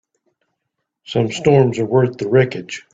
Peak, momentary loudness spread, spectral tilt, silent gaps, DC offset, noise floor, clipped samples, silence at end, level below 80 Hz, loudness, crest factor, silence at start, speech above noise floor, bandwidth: -2 dBFS; 8 LU; -7 dB/octave; none; under 0.1%; -77 dBFS; under 0.1%; 0.15 s; -56 dBFS; -16 LUFS; 16 dB; 1.1 s; 61 dB; 8 kHz